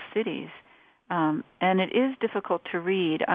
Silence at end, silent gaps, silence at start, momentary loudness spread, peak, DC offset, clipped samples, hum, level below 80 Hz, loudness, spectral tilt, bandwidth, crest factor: 0 s; none; 0 s; 8 LU; -8 dBFS; under 0.1%; under 0.1%; none; -76 dBFS; -27 LUFS; -9 dB/octave; 3.9 kHz; 18 dB